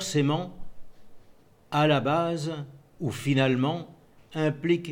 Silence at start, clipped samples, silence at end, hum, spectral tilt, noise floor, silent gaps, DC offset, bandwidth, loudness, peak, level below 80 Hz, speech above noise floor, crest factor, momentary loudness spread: 0 s; under 0.1%; 0 s; none; -6 dB/octave; -55 dBFS; none; under 0.1%; 16.5 kHz; -27 LUFS; -10 dBFS; -54 dBFS; 29 dB; 18 dB; 15 LU